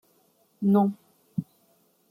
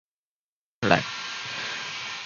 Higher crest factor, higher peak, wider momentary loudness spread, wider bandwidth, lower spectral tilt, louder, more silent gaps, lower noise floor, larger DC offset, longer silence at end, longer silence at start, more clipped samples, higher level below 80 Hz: second, 18 dB vs 28 dB; second, -12 dBFS vs -2 dBFS; first, 14 LU vs 9 LU; first, 14.5 kHz vs 7.4 kHz; first, -10.5 dB/octave vs -4 dB/octave; about the same, -26 LUFS vs -27 LUFS; neither; second, -65 dBFS vs under -90 dBFS; neither; first, 0.65 s vs 0 s; second, 0.6 s vs 0.8 s; neither; second, -72 dBFS vs -58 dBFS